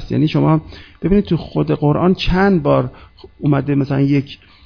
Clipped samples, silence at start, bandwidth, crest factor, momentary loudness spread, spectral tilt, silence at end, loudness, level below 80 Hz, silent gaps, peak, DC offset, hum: under 0.1%; 0 s; 5.4 kHz; 16 dB; 6 LU; -9 dB/octave; 0.3 s; -16 LUFS; -32 dBFS; none; 0 dBFS; under 0.1%; none